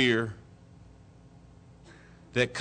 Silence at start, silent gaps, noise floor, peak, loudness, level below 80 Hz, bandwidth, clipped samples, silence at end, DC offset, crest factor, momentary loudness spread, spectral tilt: 0 s; none; -54 dBFS; -14 dBFS; -30 LUFS; -60 dBFS; 9.4 kHz; under 0.1%; 0 s; under 0.1%; 20 dB; 26 LU; -5 dB/octave